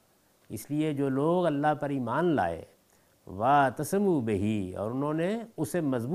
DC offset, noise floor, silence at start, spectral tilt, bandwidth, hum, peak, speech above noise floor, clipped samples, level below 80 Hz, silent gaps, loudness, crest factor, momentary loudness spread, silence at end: under 0.1%; -65 dBFS; 0.5 s; -7 dB/octave; 15.5 kHz; none; -12 dBFS; 37 dB; under 0.1%; -66 dBFS; none; -28 LUFS; 16 dB; 9 LU; 0 s